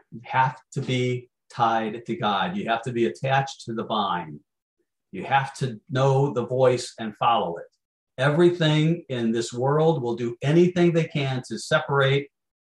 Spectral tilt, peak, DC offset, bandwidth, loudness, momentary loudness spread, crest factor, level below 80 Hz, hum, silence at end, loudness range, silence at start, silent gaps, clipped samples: -6.5 dB/octave; -6 dBFS; under 0.1%; 11 kHz; -24 LUFS; 12 LU; 18 dB; -66 dBFS; none; 0.5 s; 5 LU; 0.1 s; 4.62-4.77 s, 7.85-8.07 s; under 0.1%